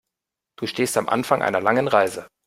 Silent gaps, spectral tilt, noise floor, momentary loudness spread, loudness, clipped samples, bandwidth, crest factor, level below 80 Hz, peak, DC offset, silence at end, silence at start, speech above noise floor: none; -4 dB/octave; -85 dBFS; 8 LU; -21 LUFS; under 0.1%; 16 kHz; 20 dB; -64 dBFS; -2 dBFS; under 0.1%; 0.2 s; 0.6 s; 64 dB